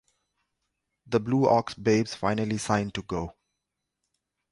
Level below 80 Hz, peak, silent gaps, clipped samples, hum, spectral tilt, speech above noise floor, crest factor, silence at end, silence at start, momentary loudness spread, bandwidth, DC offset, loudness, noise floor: -54 dBFS; -8 dBFS; none; under 0.1%; 50 Hz at -55 dBFS; -6 dB/octave; 58 dB; 20 dB; 1.2 s; 1.1 s; 11 LU; 11.5 kHz; under 0.1%; -27 LUFS; -84 dBFS